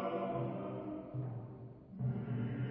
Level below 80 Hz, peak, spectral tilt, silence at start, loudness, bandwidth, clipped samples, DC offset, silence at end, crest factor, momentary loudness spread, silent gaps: -66 dBFS; -26 dBFS; -8.5 dB/octave; 0 s; -41 LUFS; 3.7 kHz; under 0.1%; under 0.1%; 0 s; 14 dB; 11 LU; none